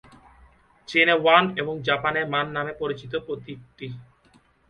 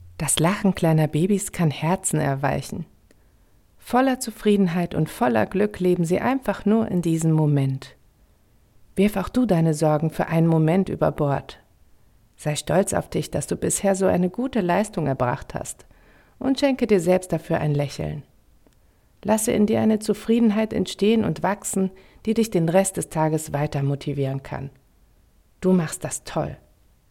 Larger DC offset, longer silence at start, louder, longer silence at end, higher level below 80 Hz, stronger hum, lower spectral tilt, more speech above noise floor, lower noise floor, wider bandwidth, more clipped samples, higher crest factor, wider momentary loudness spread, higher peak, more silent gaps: neither; first, 0.9 s vs 0 s; about the same, -22 LUFS vs -22 LUFS; about the same, 0.65 s vs 0.55 s; second, -60 dBFS vs -48 dBFS; neither; about the same, -5.5 dB/octave vs -6 dB/octave; about the same, 36 dB vs 36 dB; about the same, -59 dBFS vs -58 dBFS; second, 9 kHz vs 16 kHz; neither; about the same, 24 dB vs 20 dB; first, 21 LU vs 10 LU; about the same, -2 dBFS vs -4 dBFS; neither